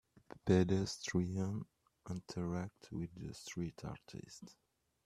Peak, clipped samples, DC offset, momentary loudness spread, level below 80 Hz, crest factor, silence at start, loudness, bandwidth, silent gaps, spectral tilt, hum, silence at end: -18 dBFS; under 0.1%; under 0.1%; 22 LU; -66 dBFS; 24 dB; 0.45 s; -40 LUFS; 12.5 kHz; none; -6 dB/octave; none; 0.55 s